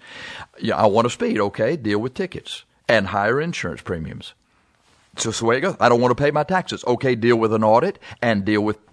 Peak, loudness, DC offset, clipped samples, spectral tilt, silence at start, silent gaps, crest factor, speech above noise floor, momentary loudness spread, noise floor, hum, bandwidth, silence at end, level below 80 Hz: 0 dBFS; -20 LUFS; under 0.1%; under 0.1%; -5.5 dB/octave; 0.05 s; none; 20 dB; 41 dB; 15 LU; -61 dBFS; none; 11 kHz; 0.15 s; -52 dBFS